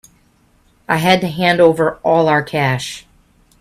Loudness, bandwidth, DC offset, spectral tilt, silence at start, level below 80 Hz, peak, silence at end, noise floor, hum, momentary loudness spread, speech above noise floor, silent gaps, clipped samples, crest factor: -15 LUFS; 15 kHz; under 0.1%; -5.5 dB/octave; 0.9 s; -52 dBFS; 0 dBFS; 0.6 s; -55 dBFS; none; 10 LU; 40 dB; none; under 0.1%; 16 dB